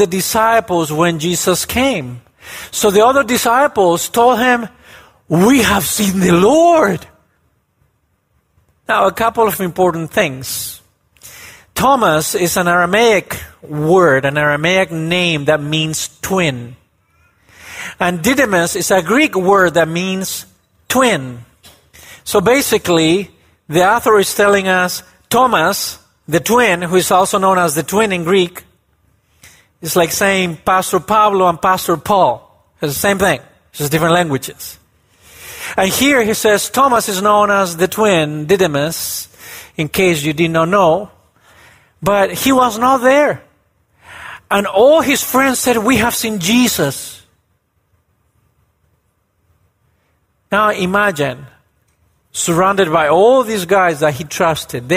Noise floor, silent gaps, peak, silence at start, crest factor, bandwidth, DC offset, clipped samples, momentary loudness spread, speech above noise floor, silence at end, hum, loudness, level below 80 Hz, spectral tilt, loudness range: -62 dBFS; none; 0 dBFS; 0 s; 14 dB; 16 kHz; under 0.1%; under 0.1%; 14 LU; 49 dB; 0 s; none; -13 LUFS; -46 dBFS; -4 dB/octave; 4 LU